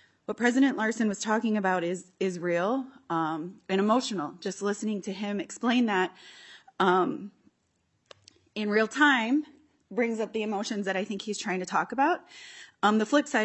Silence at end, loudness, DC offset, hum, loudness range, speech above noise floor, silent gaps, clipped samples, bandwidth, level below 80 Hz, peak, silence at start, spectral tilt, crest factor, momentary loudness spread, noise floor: 0 s; -28 LUFS; under 0.1%; none; 2 LU; 46 dB; none; under 0.1%; 8.4 kHz; -80 dBFS; -10 dBFS; 0.3 s; -4.5 dB/octave; 18 dB; 12 LU; -74 dBFS